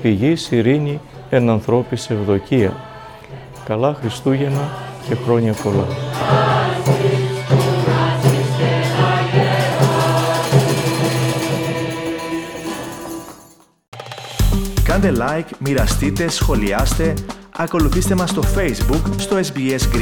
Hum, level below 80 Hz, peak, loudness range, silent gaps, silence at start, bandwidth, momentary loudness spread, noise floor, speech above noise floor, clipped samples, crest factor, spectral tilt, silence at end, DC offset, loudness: none; -28 dBFS; -2 dBFS; 5 LU; 13.88-13.92 s; 0 s; 19.5 kHz; 12 LU; -47 dBFS; 30 dB; under 0.1%; 16 dB; -6 dB/octave; 0 s; under 0.1%; -18 LUFS